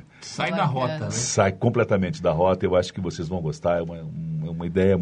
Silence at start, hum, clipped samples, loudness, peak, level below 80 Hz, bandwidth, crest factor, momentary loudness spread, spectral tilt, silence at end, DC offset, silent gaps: 0.2 s; none; under 0.1%; -24 LUFS; -4 dBFS; -50 dBFS; 10 kHz; 20 dB; 9 LU; -5.5 dB/octave; 0 s; under 0.1%; none